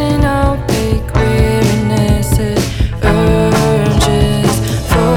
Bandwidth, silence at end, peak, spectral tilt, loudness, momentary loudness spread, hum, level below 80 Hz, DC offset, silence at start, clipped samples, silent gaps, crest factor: 18 kHz; 0 s; 0 dBFS; -6 dB/octave; -13 LUFS; 4 LU; none; -20 dBFS; under 0.1%; 0 s; under 0.1%; none; 12 dB